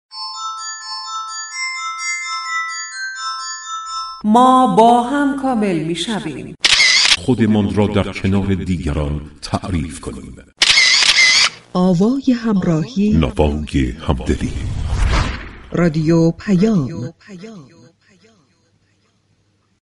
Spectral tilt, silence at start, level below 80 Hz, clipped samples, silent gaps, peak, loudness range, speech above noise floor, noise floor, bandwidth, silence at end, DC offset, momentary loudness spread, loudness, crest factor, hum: -4 dB/octave; 0.1 s; -30 dBFS; under 0.1%; none; 0 dBFS; 10 LU; 44 dB; -60 dBFS; 11.5 kHz; 2.2 s; under 0.1%; 16 LU; -15 LUFS; 16 dB; none